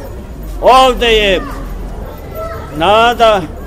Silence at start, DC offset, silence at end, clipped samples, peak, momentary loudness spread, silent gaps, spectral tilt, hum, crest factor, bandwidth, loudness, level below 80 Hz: 0 s; 0.4%; 0 s; 0.1%; 0 dBFS; 20 LU; none; -4 dB/octave; none; 12 dB; 16 kHz; -9 LUFS; -26 dBFS